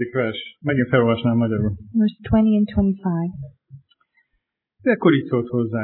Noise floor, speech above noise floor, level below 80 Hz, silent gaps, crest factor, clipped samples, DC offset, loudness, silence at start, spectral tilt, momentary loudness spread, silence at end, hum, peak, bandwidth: -74 dBFS; 55 dB; -42 dBFS; none; 18 dB; under 0.1%; under 0.1%; -20 LUFS; 0 s; -11.5 dB/octave; 9 LU; 0 s; none; -4 dBFS; 4.2 kHz